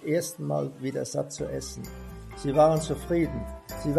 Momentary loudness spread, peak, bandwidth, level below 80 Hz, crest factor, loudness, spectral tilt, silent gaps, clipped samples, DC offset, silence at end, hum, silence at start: 17 LU; -8 dBFS; 14 kHz; -44 dBFS; 20 dB; -28 LUFS; -6 dB/octave; none; under 0.1%; under 0.1%; 0 s; none; 0 s